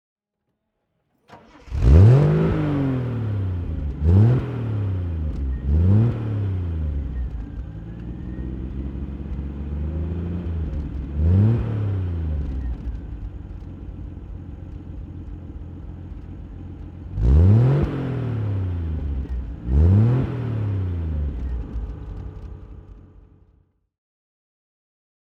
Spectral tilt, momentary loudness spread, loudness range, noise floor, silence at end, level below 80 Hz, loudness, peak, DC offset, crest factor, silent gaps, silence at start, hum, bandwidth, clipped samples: -10.5 dB/octave; 20 LU; 16 LU; -77 dBFS; 2.3 s; -28 dBFS; -22 LUFS; 0 dBFS; under 0.1%; 22 dB; none; 1.3 s; none; 5.2 kHz; under 0.1%